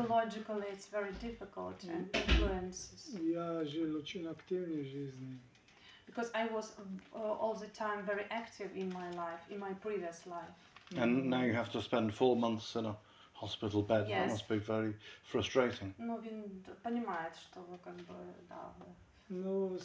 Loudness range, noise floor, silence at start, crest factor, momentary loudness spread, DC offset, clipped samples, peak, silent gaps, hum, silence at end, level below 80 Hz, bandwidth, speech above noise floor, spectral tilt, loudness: 7 LU; -62 dBFS; 0 s; 22 dB; 17 LU; under 0.1%; under 0.1%; -16 dBFS; none; none; 0 s; -50 dBFS; 8 kHz; 24 dB; -5.5 dB/octave; -38 LUFS